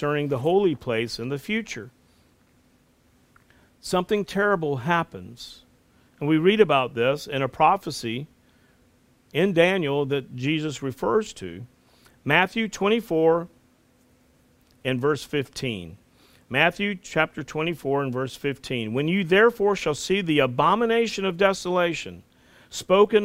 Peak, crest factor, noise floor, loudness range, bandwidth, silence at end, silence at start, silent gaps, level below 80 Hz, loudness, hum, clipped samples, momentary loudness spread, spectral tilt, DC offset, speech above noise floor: -2 dBFS; 22 dB; -61 dBFS; 6 LU; 16 kHz; 0 s; 0 s; none; -58 dBFS; -23 LUFS; none; under 0.1%; 15 LU; -5.5 dB/octave; under 0.1%; 38 dB